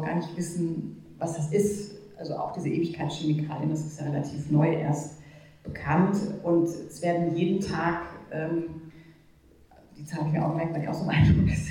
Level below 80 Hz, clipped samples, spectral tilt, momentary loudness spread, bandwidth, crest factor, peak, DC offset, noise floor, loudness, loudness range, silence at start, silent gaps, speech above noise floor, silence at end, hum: -46 dBFS; under 0.1%; -7 dB/octave; 14 LU; 13.5 kHz; 18 dB; -10 dBFS; under 0.1%; -57 dBFS; -28 LUFS; 4 LU; 0 s; none; 30 dB; 0 s; none